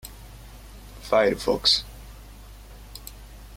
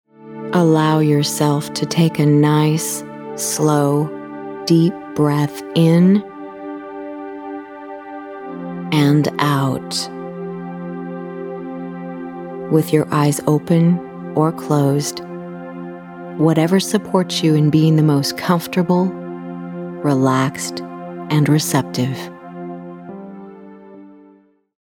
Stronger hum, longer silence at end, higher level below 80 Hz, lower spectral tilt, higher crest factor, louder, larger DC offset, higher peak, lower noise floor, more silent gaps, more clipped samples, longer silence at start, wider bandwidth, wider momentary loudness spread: neither; second, 0 s vs 0.65 s; first, -44 dBFS vs -60 dBFS; second, -3 dB/octave vs -6 dB/octave; about the same, 20 dB vs 18 dB; second, -22 LUFS vs -17 LUFS; neither; second, -8 dBFS vs 0 dBFS; second, -44 dBFS vs -51 dBFS; neither; neither; second, 0.05 s vs 0.2 s; about the same, 16.5 kHz vs 17.5 kHz; first, 26 LU vs 17 LU